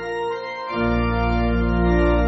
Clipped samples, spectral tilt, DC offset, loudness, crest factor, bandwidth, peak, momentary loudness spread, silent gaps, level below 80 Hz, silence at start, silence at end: under 0.1%; -6.5 dB/octave; under 0.1%; -21 LUFS; 14 dB; 6 kHz; -6 dBFS; 8 LU; none; -26 dBFS; 0 s; 0 s